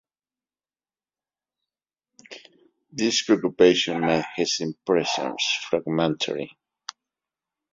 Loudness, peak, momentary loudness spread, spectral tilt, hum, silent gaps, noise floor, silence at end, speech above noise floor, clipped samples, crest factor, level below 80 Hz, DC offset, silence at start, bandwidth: -23 LUFS; -4 dBFS; 22 LU; -3.5 dB/octave; none; none; under -90 dBFS; 1.25 s; over 67 dB; under 0.1%; 22 dB; -66 dBFS; under 0.1%; 2.3 s; 7.8 kHz